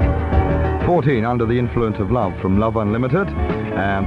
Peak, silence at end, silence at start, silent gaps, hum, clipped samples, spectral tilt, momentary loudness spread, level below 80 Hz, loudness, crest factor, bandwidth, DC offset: -4 dBFS; 0 s; 0 s; none; none; under 0.1%; -9.5 dB/octave; 4 LU; -26 dBFS; -19 LUFS; 12 dB; 5.4 kHz; under 0.1%